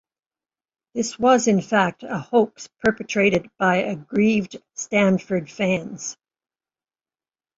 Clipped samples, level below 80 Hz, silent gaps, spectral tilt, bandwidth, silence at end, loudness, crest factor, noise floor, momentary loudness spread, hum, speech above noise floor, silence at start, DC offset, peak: under 0.1%; -60 dBFS; none; -5 dB/octave; 8 kHz; 1.45 s; -21 LUFS; 20 dB; under -90 dBFS; 13 LU; none; over 69 dB; 0.95 s; under 0.1%; -2 dBFS